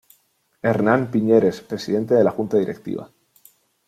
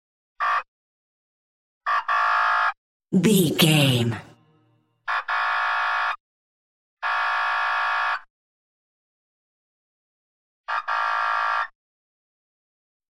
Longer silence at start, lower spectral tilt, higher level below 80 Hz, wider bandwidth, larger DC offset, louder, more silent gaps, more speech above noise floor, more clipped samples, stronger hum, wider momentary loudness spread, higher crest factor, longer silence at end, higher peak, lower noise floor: first, 0.65 s vs 0.4 s; first, -7.5 dB/octave vs -4.5 dB/octave; first, -62 dBFS vs -68 dBFS; about the same, 15 kHz vs 16 kHz; neither; about the same, -20 LUFS vs -22 LUFS; second, none vs 0.68-1.81 s, 2.77-3.00 s, 6.20-6.97 s, 8.30-10.64 s; about the same, 45 dB vs 45 dB; neither; neither; about the same, 13 LU vs 12 LU; about the same, 18 dB vs 22 dB; second, 0.8 s vs 1.45 s; about the same, -2 dBFS vs -4 dBFS; about the same, -64 dBFS vs -64 dBFS